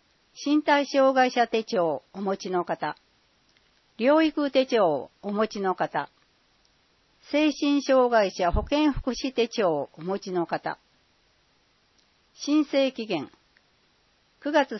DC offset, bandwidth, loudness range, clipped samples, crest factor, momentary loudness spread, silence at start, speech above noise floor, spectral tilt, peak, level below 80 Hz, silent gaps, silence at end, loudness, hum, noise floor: under 0.1%; 6.2 kHz; 6 LU; under 0.1%; 20 dB; 11 LU; 0.35 s; 41 dB; -5 dB/octave; -8 dBFS; -46 dBFS; none; 0 s; -25 LUFS; none; -66 dBFS